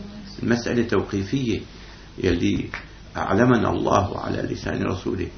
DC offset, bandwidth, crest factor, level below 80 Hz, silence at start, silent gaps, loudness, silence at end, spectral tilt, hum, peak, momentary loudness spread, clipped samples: under 0.1%; 6.6 kHz; 22 dB; -42 dBFS; 0 s; none; -23 LUFS; 0 s; -6.5 dB/octave; none; -2 dBFS; 16 LU; under 0.1%